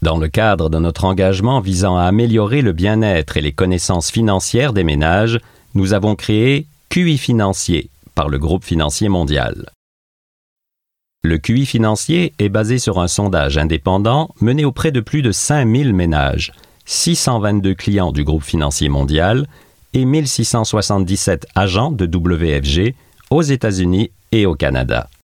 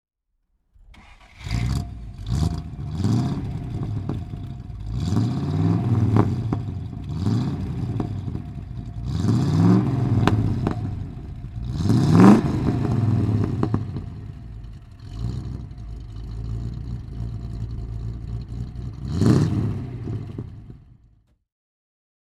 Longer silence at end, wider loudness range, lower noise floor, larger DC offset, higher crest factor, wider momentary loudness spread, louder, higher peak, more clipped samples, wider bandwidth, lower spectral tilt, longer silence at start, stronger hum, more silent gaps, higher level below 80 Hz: second, 0.25 s vs 1.4 s; second, 4 LU vs 13 LU; first, -80 dBFS vs -71 dBFS; first, 0.2% vs under 0.1%; second, 14 dB vs 24 dB; second, 5 LU vs 17 LU; first, -16 LUFS vs -23 LUFS; about the same, 0 dBFS vs 0 dBFS; neither; first, 16 kHz vs 11.5 kHz; second, -5.5 dB/octave vs -8 dB/octave; second, 0 s vs 0.9 s; neither; first, 9.75-10.56 s vs none; first, -28 dBFS vs -36 dBFS